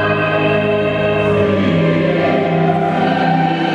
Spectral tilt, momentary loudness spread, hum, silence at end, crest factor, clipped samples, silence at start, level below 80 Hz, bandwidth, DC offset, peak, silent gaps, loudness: -8 dB/octave; 1 LU; none; 0 s; 12 dB; under 0.1%; 0 s; -44 dBFS; 7.4 kHz; under 0.1%; -2 dBFS; none; -14 LUFS